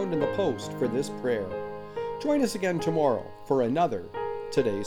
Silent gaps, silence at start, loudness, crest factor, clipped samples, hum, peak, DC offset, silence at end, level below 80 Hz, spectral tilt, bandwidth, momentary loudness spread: none; 0 s; -28 LUFS; 16 dB; under 0.1%; none; -12 dBFS; under 0.1%; 0 s; -56 dBFS; -6 dB/octave; 18.5 kHz; 9 LU